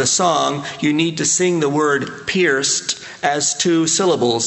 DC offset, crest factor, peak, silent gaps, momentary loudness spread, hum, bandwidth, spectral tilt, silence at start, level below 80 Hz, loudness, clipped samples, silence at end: under 0.1%; 16 dB; -2 dBFS; none; 6 LU; none; 8.8 kHz; -3 dB/octave; 0 s; -58 dBFS; -17 LUFS; under 0.1%; 0 s